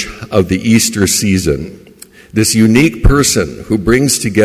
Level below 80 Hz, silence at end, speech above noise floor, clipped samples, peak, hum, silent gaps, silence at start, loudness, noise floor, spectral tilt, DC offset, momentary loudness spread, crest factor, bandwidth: -24 dBFS; 0 s; 28 dB; under 0.1%; 0 dBFS; none; none; 0 s; -12 LUFS; -39 dBFS; -4.5 dB/octave; under 0.1%; 8 LU; 12 dB; 16 kHz